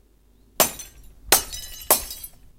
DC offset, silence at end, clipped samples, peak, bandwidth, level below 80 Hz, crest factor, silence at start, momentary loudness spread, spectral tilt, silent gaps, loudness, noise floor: under 0.1%; 0.3 s; under 0.1%; 0 dBFS; 17 kHz; -46 dBFS; 26 dB; 0.6 s; 18 LU; -0.5 dB/octave; none; -20 LUFS; -56 dBFS